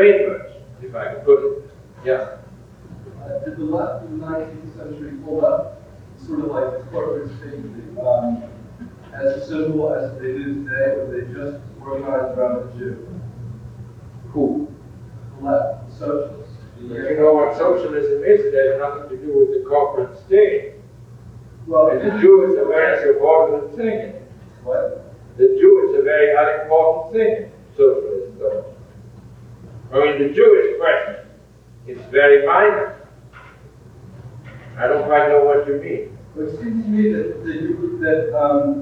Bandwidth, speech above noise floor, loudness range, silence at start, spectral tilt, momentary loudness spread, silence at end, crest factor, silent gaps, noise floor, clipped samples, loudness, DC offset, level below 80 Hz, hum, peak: 5.2 kHz; 28 dB; 10 LU; 0 s; -8 dB/octave; 21 LU; 0 s; 18 dB; none; -45 dBFS; under 0.1%; -18 LUFS; under 0.1%; -50 dBFS; none; 0 dBFS